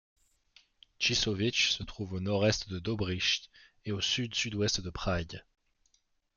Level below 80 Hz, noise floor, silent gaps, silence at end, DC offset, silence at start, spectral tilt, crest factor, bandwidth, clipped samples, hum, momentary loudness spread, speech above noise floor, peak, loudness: -52 dBFS; -73 dBFS; none; 0.95 s; under 0.1%; 1 s; -3.5 dB/octave; 20 dB; 7.4 kHz; under 0.1%; none; 10 LU; 41 dB; -14 dBFS; -31 LUFS